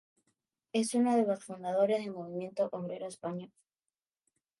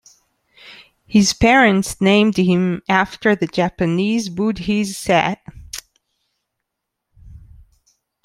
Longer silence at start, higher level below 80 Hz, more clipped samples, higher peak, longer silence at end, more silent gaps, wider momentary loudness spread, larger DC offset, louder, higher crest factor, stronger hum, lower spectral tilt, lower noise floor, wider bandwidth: about the same, 0.75 s vs 0.65 s; second, -86 dBFS vs -44 dBFS; neither; second, -16 dBFS vs 0 dBFS; first, 1.15 s vs 0.85 s; neither; about the same, 12 LU vs 11 LU; neither; second, -33 LUFS vs -16 LUFS; about the same, 18 dB vs 18 dB; neither; about the same, -5.5 dB/octave vs -5 dB/octave; first, under -90 dBFS vs -79 dBFS; second, 11.5 kHz vs 15 kHz